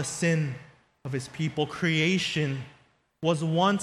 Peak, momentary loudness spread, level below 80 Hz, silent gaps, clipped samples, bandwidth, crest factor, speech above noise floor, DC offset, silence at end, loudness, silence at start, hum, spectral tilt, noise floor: -10 dBFS; 13 LU; -64 dBFS; none; under 0.1%; 12.5 kHz; 18 dB; 35 dB; under 0.1%; 0 s; -27 LUFS; 0 s; none; -5 dB/octave; -62 dBFS